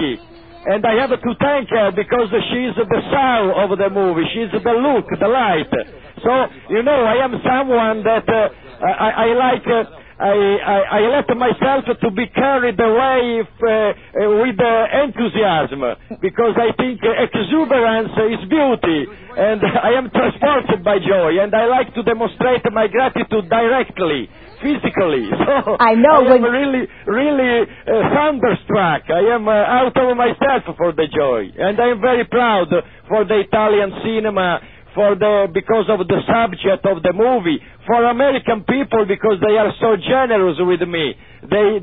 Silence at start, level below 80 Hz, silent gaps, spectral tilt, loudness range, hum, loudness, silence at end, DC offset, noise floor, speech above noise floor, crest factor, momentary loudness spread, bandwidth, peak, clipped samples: 0 s; -46 dBFS; none; -11 dB/octave; 2 LU; none; -16 LUFS; 0 s; 0.3%; -39 dBFS; 24 dB; 16 dB; 5 LU; 4.7 kHz; 0 dBFS; under 0.1%